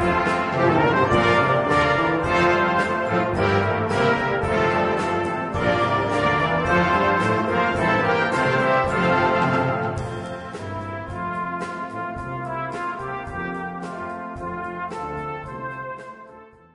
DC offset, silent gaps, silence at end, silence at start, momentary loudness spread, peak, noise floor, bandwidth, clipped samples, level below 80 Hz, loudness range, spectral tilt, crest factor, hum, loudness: under 0.1%; none; 0.3 s; 0 s; 13 LU; -6 dBFS; -46 dBFS; 11 kHz; under 0.1%; -46 dBFS; 10 LU; -6.5 dB/octave; 16 dB; none; -22 LUFS